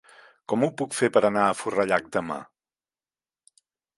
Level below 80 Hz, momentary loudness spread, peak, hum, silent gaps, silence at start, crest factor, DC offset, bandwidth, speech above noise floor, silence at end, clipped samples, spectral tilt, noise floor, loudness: -66 dBFS; 13 LU; -4 dBFS; none; none; 0.5 s; 22 dB; under 0.1%; 11.5 kHz; over 66 dB; 1.55 s; under 0.1%; -5 dB/octave; under -90 dBFS; -24 LUFS